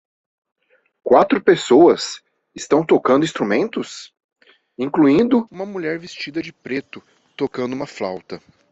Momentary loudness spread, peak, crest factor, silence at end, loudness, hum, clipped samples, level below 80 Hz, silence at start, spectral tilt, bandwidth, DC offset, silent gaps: 18 LU; -2 dBFS; 18 dB; 0.35 s; -18 LUFS; none; under 0.1%; -60 dBFS; 1.05 s; -5.5 dB/octave; 8.2 kHz; under 0.1%; 4.24-4.29 s